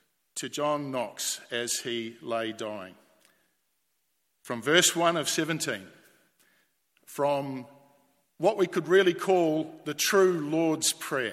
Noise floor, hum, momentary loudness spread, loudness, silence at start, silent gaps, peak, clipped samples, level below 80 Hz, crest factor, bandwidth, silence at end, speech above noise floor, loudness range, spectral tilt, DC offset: -77 dBFS; none; 15 LU; -27 LUFS; 0.35 s; none; -6 dBFS; under 0.1%; -78 dBFS; 24 dB; 16 kHz; 0 s; 49 dB; 8 LU; -3 dB/octave; under 0.1%